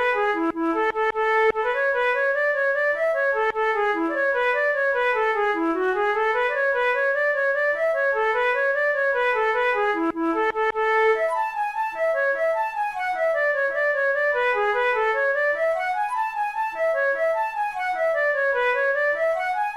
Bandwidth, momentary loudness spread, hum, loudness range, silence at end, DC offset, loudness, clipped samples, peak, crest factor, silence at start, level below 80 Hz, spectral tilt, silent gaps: 12.5 kHz; 4 LU; none; 2 LU; 0 s; 0.1%; -22 LUFS; under 0.1%; -12 dBFS; 12 dB; 0 s; -58 dBFS; -3.5 dB/octave; none